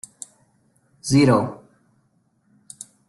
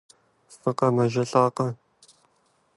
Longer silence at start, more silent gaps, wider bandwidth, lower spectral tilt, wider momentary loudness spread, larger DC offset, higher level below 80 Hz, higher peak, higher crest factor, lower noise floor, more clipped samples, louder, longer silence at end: first, 1.05 s vs 0.5 s; neither; about the same, 12 kHz vs 11.5 kHz; about the same, -6 dB/octave vs -7 dB/octave; first, 24 LU vs 9 LU; neither; first, -56 dBFS vs -68 dBFS; about the same, -4 dBFS vs -6 dBFS; about the same, 20 dB vs 22 dB; about the same, -65 dBFS vs -67 dBFS; neither; first, -19 LUFS vs -24 LUFS; first, 1.55 s vs 1.05 s